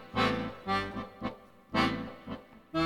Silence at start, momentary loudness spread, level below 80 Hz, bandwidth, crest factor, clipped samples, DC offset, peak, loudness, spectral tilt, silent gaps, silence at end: 0 s; 15 LU; -54 dBFS; 18 kHz; 18 dB; under 0.1%; under 0.1%; -14 dBFS; -33 LUFS; -5.5 dB/octave; none; 0 s